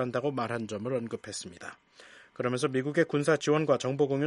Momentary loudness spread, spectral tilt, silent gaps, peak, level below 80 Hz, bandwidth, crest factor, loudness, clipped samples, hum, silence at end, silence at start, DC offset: 15 LU; -5.5 dB/octave; none; -10 dBFS; -72 dBFS; 11.5 kHz; 20 dB; -30 LUFS; under 0.1%; none; 0 s; 0 s; under 0.1%